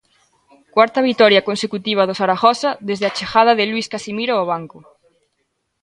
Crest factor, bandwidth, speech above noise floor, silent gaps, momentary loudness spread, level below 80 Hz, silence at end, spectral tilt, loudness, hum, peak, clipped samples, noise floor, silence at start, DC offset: 18 dB; 11 kHz; 54 dB; none; 10 LU; -60 dBFS; 1.05 s; -4.5 dB/octave; -17 LUFS; none; 0 dBFS; under 0.1%; -70 dBFS; 0.75 s; under 0.1%